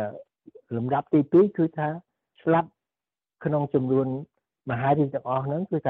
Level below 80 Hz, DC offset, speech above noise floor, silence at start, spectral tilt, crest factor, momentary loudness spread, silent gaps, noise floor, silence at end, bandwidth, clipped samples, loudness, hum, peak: -66 dBFS; under 0.1%; over 66 dB; 0 s; -11.5 dB/octave; 16 dB; 15 LU; none; under -90 dBFS; 0 s; 4.1 kHz; under 0.1%; -25 LUFS; none; -10 dBFS